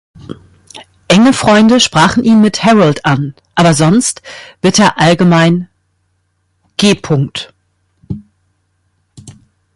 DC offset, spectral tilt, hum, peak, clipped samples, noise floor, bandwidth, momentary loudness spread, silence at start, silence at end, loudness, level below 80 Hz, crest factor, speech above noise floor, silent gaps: under 0.1%; -5 dB/octave; none; 0 dBFS; under 0.1%; -61 dBFS; 11.5 kHz; 19 LU; 0.3 s; 0.45 s; -10 LUFS; -44 dBFS; 12 dB; 52 dB; none